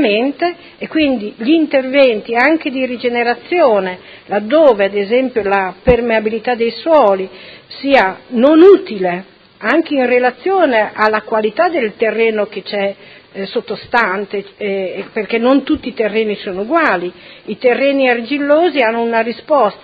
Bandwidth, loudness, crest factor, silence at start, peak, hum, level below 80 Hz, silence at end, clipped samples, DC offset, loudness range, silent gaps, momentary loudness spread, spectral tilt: 6.8 kHz; -14 LUFS; 14 dB; 0 s; 0 dBFS; none; -44 dBFS; 0.05 s; 0.1%; under 0.1%; 5 LU; none; 11 LU; -7.5 dB/octave